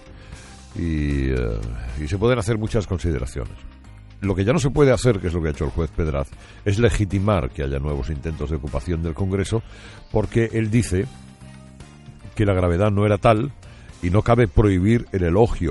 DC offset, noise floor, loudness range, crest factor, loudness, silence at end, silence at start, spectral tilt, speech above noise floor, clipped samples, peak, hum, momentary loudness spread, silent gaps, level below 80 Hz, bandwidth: under 0.1%; -42 dBFS; 5 LU; 18 dB; -21 LUFS; 0 s; 0.05 s; -7 dB/octave; 22 dB; under 0.1%; -2 dBFS; none; 13 LU; none; -32 dBFS; 11.5 kHz